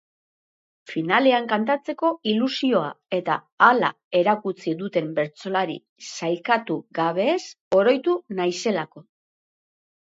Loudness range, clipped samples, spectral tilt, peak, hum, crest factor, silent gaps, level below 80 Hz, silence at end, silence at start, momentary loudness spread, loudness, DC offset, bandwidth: 4 LU; under 0.1%; -5 dB/octave; -2 dBFS; none; 22 dB; 3.52-3.58 s, 4.04-4.11 s, 5.89-5.96 s, 7.61-7.71 s; -74 dBFS; 1.1 s; 0.9 s; 10 LU; -23 LUFS; under 0.1%; 8 kHz